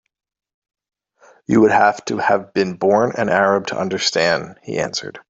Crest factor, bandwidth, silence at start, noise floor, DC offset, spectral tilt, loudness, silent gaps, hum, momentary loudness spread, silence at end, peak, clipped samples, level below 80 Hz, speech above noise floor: 18 dB; 8 kHz; 1.5 s; -52 dBFS; under 0.1%; -4.5 dB/octave; -17 LUFS; none; none; 9 LU; 0.1 s; -2 dBFS; under 0.1%; -58 dBFS; 35 dB